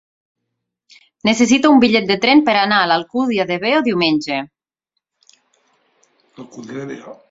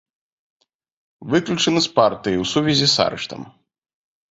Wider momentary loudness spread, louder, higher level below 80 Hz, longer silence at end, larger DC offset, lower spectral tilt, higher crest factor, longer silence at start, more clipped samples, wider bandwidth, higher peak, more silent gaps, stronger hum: first, 20 LU vs 14 LU; first, -15 LUFS vs -18 LUFS; about the same, -58 dBFS vs -54 dBFS; second, 0.15 s vs 0.85 s; neither; about the same, -4 dB/octave vs -4 dB/octave; about the same, 16 dB vs 20 dB; about the same, 1.25 s vs 1.2 s; neither; about the same, 7.8 kHz vs 8 kHz; about the same, 0 dBFS vs -2 dBFS; neither; neither